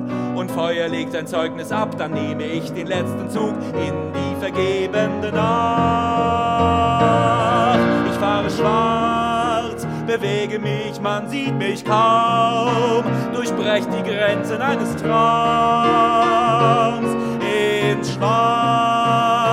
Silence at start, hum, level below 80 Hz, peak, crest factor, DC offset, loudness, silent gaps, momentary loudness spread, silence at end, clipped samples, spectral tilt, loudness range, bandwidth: 0 s; none; -52 dBFS; -2 dBFS; 16 dB; 0.1%; -19 LUFS; none; 8 LU; 0 s; under 0.1%; -6 dB/octave; 6 LU; 15.5 kHz